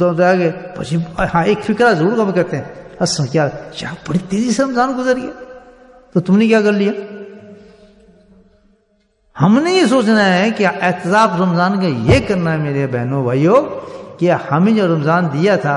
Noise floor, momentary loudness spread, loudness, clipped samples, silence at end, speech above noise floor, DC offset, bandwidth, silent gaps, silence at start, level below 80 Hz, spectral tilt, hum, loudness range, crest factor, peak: -60 dBFS; 13 LU; -15 LUFS; under 0.1%; 0 s; 45 dB; under 0.1%; 11 kHz; none; 0 s; -42 dBFS; -6 dB/octave; none; 5 LU; 14 dB; -2 dBFS